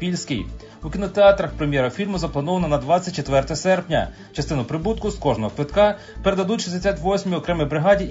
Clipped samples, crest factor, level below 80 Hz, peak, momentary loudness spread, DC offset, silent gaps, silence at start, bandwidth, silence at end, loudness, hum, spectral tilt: under 0.1%; 18 dB; -36 dBFS; -2 dBFS; 9 LU; under 0.1%; none; 0 s; 7.8 kHz; 0 s; -21 LUFS; none; -6 dB/octave